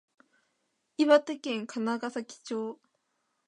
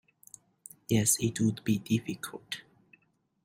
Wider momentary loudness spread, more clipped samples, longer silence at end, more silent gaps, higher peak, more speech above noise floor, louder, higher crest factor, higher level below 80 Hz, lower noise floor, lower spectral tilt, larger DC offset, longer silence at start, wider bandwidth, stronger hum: second, 16 LU vs 20 LU; neither; about the same, 0.75 s vs 0.85 s; neither; first, -8 dBFS vs -12 dBFS; first, 49 dB vs 40 dB; about the same, -29 LUFS vs -30 LUFS; about the same, 24 dB vs 22 dB; second, -88 dBFS vs -64 dBFS; first, -78 dBFS vs -69 dBFS; about the same, -4 dB/octave vs -4.5 dB/octave; neither; about the same, 1 s vs 0.9 s; second, 10.5 kHz vs 16 kHz; neither